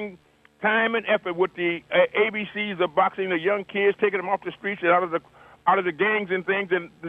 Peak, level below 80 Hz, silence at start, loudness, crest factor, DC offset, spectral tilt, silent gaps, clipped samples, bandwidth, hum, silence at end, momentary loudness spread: -6 dBFS; -68 dBFS; 0 s; -23 LUFS; 18 dB; under 0.1%; -7 dB/octave; none; under 0.1%; 4.3 kHz; none; 0 s; 6 LU